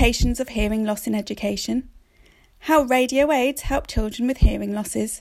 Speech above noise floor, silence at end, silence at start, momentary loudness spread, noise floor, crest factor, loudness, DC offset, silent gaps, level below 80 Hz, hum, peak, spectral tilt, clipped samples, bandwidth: 33 dB; 0 s; 0 s; 8 LU; -55 dBFS; 18 dB; -22 LUFS; under 0.1%; none; -28 dBFS; none; -4 dBFS; -5 dB/octave; under 0.1%; 16 kHz